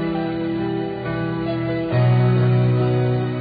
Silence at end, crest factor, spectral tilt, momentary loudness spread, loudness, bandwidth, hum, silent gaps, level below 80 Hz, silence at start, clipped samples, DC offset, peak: 0 s; 12 dB; -12.5 dB/octave; 8 LU; -20 LUFS; 4.9 kHz; none; none; -46 dBFS; 0 s; under 0.1%; under 0.1%; -8 dBFS